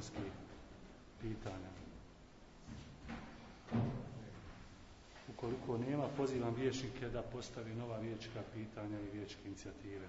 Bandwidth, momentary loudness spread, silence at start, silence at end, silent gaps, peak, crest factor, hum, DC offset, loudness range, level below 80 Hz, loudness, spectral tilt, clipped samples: 7.6 kHz; 19 LU; 0 s; 0 s; none; -26 dBFS; 20 dB; none; under 0.1%; 9 LU; -60 dBFS; -45 LUFS; -6 dB/octave; under 0.1%